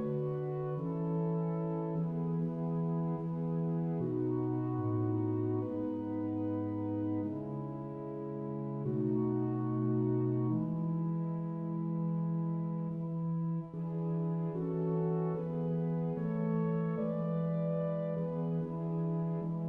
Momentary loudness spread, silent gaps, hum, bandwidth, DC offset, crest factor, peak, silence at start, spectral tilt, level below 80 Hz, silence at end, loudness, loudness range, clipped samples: 4 LU; none; none; 3.1 kHz; under 0.1%; 12 dB; -22 dBFS; 0 s; -12.5 dB/octave; -68 dBFS; 0 s; -35 LUFS; 2 LU; under 0.1%